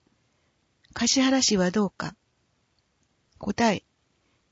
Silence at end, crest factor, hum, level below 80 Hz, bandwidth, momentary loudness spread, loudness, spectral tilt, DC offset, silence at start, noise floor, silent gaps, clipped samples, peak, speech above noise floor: 0.7 s; 20 dB; none; -58 dBFS; 8 kHz; 16 LU; -24 LUFS; -3.5 dB/octave; under 0.1%; 0.95 s; -70 dBFS; none; under 0.1%; -8 dBFS; 47 dB